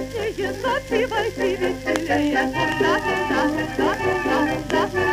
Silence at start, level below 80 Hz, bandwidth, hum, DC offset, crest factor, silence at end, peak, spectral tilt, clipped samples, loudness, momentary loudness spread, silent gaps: 0 s; -42 dBFS; 15.5 kHz; 50 Hz at -40 dBFS; under 0.1%; 20 dB; 0 s; -2 dBFS; -5 dB/octave; under 0.1%; -22 LUFS; 4 LU; none